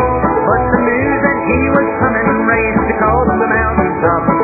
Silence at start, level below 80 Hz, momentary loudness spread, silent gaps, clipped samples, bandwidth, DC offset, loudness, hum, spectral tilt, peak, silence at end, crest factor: 0 s; -28 dBFS; 1 LU; none; under 0.1%; 2.7 kHz; under 0.1%; -13 LUFS; none; -12.5 dB/octave; 0 dBFS; 0 s; 12 dB